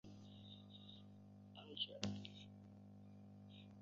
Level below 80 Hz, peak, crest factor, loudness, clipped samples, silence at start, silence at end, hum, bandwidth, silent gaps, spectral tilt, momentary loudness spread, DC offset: -76 dBFS; -20 dBFS; 34 dB; -54 LUFS; under 0.1%; 0.05 s; 0 s; 50 Hz at -65 dBFS; 7.2 kHz; none; -4 dB/octave; 15 LU; under 0.1%